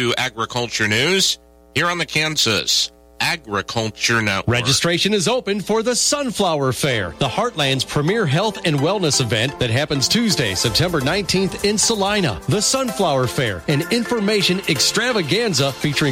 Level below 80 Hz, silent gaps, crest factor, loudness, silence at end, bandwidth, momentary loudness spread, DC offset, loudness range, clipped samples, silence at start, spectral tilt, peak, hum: -46 dBFS; none; 14 dB; -18 LUFS; 0 s; 16 kHz; 5 LU; under 0.1%; 1 LU; under 0.1%; 0 s; -3.5 dB/octave; -4 dBFS; none